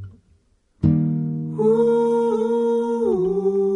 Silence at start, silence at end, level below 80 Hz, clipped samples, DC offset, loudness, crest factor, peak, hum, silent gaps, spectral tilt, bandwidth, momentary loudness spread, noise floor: 0 s; 0 s; -48 dBFS; under 0.1%; under 0.1%; -20 LUFS; 14 dB; -6 dBFS; none; none; -10 dB/octave; 10.5 kHz; 5 LU; -60 dBFS